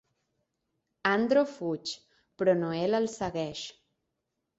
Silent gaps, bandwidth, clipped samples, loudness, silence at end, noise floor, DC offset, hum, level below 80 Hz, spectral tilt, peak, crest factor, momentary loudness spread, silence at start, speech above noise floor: none; 8 kHz; under 0.1%; -29 LUFS; 0.85 s; -83 dBFS; under 0.1%; none; -66 dBFS; -5 dB/octave; -10 dBFS; 20 dB; 13 LU; 1.05 s; 55 dB